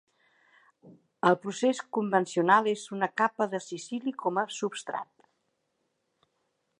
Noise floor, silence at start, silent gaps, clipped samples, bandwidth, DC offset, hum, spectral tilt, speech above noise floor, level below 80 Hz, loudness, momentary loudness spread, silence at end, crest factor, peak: -78 dBFS; 0.85 s; none; under 0.1%; 11 kHz; under 0.1%; none; -4.5 dB/octave; 50 dB; -86 dBFS; -29 LUFS; 13 LU; 1.75 s; 22 dB; -8 dBFS